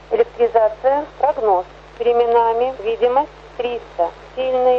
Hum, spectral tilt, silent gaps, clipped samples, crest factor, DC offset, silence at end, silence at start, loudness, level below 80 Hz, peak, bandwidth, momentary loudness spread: 50 Hz at -45 dBFS; -6 dB/octave; none; under 0.1%; 14 dB; under 0.1%; 0 s; 0.1 s; -18 LUFS; -48 dBFS; -2 dBFS; 6.2 kHz; 9 LU